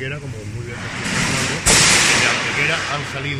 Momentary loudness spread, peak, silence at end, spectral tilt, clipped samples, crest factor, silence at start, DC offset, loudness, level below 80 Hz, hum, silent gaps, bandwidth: 18 LU; 0 dBFS; 0 s; -2 dB/octave; under 0.1%; 18 dB; 0 s; under 0.1%; -15 LUFS; -38 dBFS; none; none; 15.5 kHz